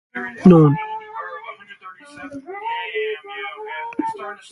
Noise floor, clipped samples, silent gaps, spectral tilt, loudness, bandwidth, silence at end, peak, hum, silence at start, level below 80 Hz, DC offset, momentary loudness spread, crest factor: -41 dBFS; under 0.1%; none; -8.5 dB/octave; -19 LUFS; 10.5 kHz; 0.05 s; 0 dBFS; none; 0.15 s; -54 dBFS; under 0.1%; 25 LU; 20 dB